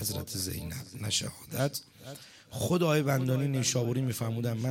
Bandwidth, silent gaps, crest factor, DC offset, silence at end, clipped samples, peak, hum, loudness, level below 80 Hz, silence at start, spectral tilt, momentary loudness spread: 17 kHz; none; 18 dB; under 0.1%; 0 s; under 0.1%; -14 dBFS; none; -31 LUFS; -58 dBFS; 0 s; -4.5 dB/octave; 16 LU